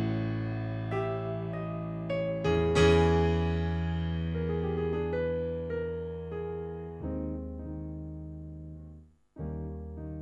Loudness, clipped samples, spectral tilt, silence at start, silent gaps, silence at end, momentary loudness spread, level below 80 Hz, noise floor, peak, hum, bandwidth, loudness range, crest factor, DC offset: -31 LUFS; under 0.1%; -7.5 dB/octave; 0 s; none; 0 s; 16 LU; -46 dBFS; -53 dBFS; -12 dBFS; none; 9.8 kHz; 12 LU; 18 dB; under 0.1%